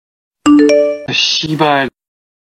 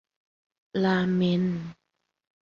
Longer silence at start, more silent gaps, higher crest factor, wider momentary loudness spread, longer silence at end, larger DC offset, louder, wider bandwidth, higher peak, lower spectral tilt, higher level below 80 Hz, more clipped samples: second, 0.45 s vs 0.75 s; neither; about the same, 14 dB vs 16 dB; second, 8 LU vs 11 LU; about the same, 0.65 s vs 0.7 s; neither; first, -12 LUFS vs -26 LUFS; first, 10.5 kHz vs 6.8 kHz; first, 0 dBFS vs -12 dBFS; second, -4 dB/octave vs -8 dB/octave; first, -52 dBFS vs -64 dBFS; neither